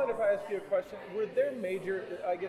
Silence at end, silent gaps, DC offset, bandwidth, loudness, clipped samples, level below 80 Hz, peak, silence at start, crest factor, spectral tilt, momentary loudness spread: 0 s; none; under 0.1%; 13.5 kHz; -33 LUFS; under 0.1%; -72 dBFS; -18 dBFS; 0 s; 14 dB; -6 dB/octave; 6 LU